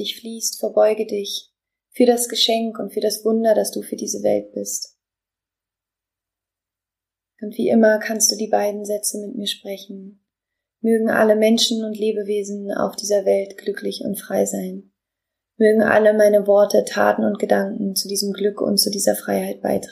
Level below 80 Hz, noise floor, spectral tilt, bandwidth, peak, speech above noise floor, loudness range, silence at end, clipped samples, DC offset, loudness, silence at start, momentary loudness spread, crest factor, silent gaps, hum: -68 dBFS; -88 dBFS; -3 dB/octave; 15.5 kHz; -2 dBFS; 69 dB; 7 LU; 0 s; under 0.1%; under 0.1%; -19 LUFS; 0 s; 12 LU; 18 dB; none; none